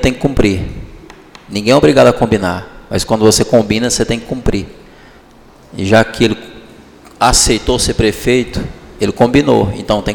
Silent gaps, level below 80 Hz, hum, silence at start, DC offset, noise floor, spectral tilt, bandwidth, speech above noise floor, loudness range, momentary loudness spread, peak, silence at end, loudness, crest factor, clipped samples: none; -28 dBFS; none; 0 s; under 0.1%; -41 dBFS; -4.5 dB/octave; 19.5 kHz; 29 dB; 4 LU; 14 LU; 0 dBFS; 0 s; -12 LUFS; 14 dB; under 0.1%